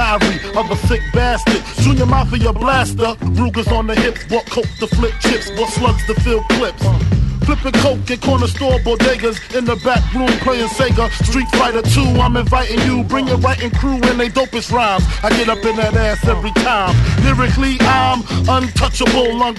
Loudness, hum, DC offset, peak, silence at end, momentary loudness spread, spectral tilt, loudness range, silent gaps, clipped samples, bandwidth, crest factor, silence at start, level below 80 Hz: -15 LUFS; none; under 0.1%; 0 dBFS; 0 s; 4 LU; -5.5 dB/octave; 2 LU; none; under 0.1%; 12.5 kHz; 14 dB; 0 s; -22 dBFS